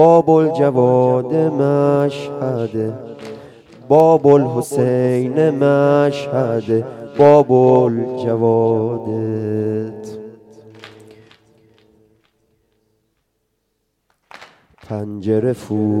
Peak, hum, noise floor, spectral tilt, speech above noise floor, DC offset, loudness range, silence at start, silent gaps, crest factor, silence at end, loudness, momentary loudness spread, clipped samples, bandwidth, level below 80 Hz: 0 dBFS; none; -70 dBFS; -8.5 dB/octave; 55 dB; under 0.1%; 13 LU; 0 s; none; 16 dB; 0 s; -15 LUFS; 16 LU; under 0.1%; 13 kHz; -62 dBFS